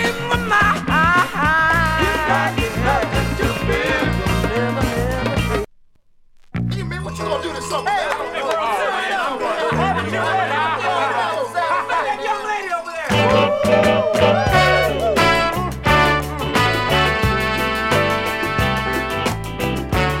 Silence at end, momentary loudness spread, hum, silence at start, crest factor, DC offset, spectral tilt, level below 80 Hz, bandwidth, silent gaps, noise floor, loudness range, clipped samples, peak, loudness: 0 s; 8 LU; none; 0 s; 18 dB; under 0.1%; -5 dB/octave; -32 dBFS; 16.5 kHz; none; -50 dBFS; 7 LU; under 0.1%; -2 dBFS; -18 LUFS